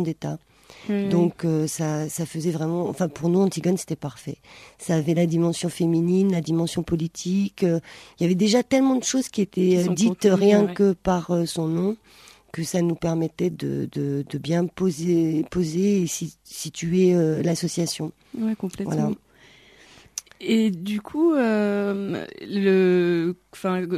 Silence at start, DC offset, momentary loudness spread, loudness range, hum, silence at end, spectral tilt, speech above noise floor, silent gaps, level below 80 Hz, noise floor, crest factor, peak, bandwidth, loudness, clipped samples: 0 s; under 0.1%; 12 LU; 5 LU; none; 0 s; -6 dB/octave; 30 dB; none; -56 dBFS; -53 dBFS; 18 dB; -4 dBFS; 14 kHz; -23 LUFS; under 0.1%